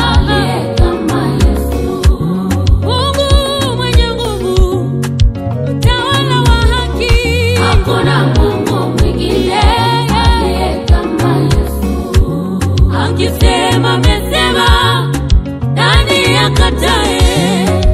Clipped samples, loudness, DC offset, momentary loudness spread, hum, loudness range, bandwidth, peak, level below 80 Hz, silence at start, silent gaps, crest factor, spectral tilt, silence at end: 0.3%; -12 LUFS; 0.1%; 5 LU; none; 2 LU; 15 kHz; 0 dBFS; -16 dBFS; 0 s; none; 10 dB; -5.5 dB/octave; 0 s